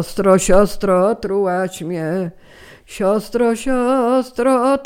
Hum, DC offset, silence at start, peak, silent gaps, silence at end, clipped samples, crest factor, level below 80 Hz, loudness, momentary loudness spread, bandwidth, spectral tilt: none; under 0.1%; 0 s; 0 dBFS; none; 0 s; under 0.1%; 16 dB; -34 dBFS; -17 LUFS; 9 LU; 16.5 kHz; -5.5 dB/octave